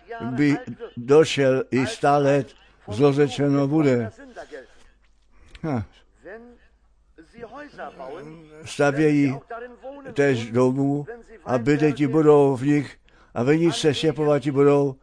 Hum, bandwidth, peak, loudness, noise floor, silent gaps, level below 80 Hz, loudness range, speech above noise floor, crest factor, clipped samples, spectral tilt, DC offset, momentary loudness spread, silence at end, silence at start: none; 10.5 kHz; -4 dBFS; -21 LUFS; -58 dBFS; none; -56 dBFS; 16 LU; 37 dB; 18 dB; under 0.1%; -6.5 dB/octave; under 0.1%; 22 LU; 0.1 s; 0.1 s